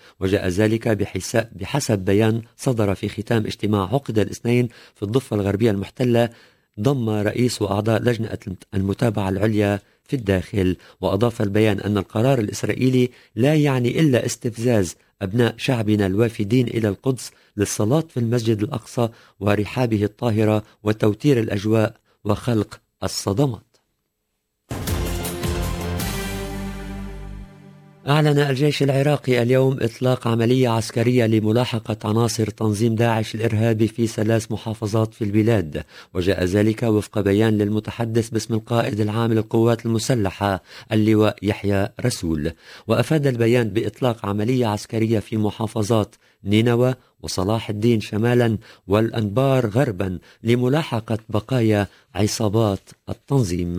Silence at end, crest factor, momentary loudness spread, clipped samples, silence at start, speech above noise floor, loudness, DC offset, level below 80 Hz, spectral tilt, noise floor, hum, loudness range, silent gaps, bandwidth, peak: 0 s; 18 dB; 8 LU; under 0.1%; 0.2 s; 55 dB; -21 LUFS; under 0.1%; -42 dBFS; -6.5 dB/octave; -75 dBFS; none; 3 LU; none; 16 kHz; -2 dBFS